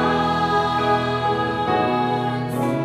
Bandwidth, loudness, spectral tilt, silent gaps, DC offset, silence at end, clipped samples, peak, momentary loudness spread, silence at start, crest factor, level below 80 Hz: 15 kHz; -21 LUFS; -6.5 dB/octave; none; under 0.1%; 0 s; under 0.1%; -8 dBFS; 4 LU; 0 s; 12 dB; -46 dBFS